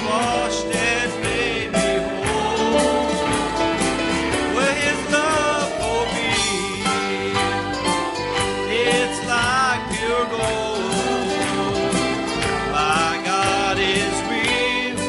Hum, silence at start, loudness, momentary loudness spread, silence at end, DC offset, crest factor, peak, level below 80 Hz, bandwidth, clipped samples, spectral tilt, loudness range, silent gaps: none; 0 s; -20 LUFS; 4 LU; 0 s; under 0.1%; 16 dB; -4 dBFS; -42 dBFS; 11.5 kHz; under 0.1%; -3.5 dB/octave; 1 LU; none